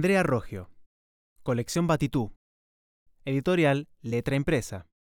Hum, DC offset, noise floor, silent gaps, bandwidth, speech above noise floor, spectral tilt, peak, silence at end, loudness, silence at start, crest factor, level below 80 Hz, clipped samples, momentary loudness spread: none; under 0.1%; under -90 dBFS; 0.86-1.36 s, 2.36-3.06 s; 17.5 kHz; over 63 dB; -6 dB/octave; -12 dBFS; 0.2 s; -27 LUFS; 0 s; 18 dB; -50 dBFS; under 0.1%; 15 LU